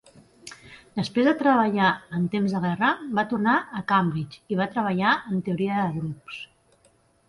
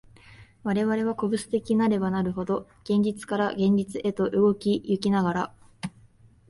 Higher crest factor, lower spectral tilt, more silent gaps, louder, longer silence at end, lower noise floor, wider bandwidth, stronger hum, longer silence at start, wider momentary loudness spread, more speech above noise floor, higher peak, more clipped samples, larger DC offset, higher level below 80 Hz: about the same, 18 dB vs 14 dB; about the same, -7 dB/octave vs -7 dB/octave; neither; about the same, -24 LUFS vs -26 LUFS; first, 0.85 s vs 0.6 s; first, -62 dBFS vs -56 dBFS; about the same, 11.5 kHz vs 11.5 kHz; neither; first, 0.45 s vs 0.3 s; first, 18 LU vs 10 LU; first, 38 dB vs 31 dB; about the same, -8 dBFS vs -10 dBFS; neither; neither; about the same, -62 dBFS vs -58 dBFS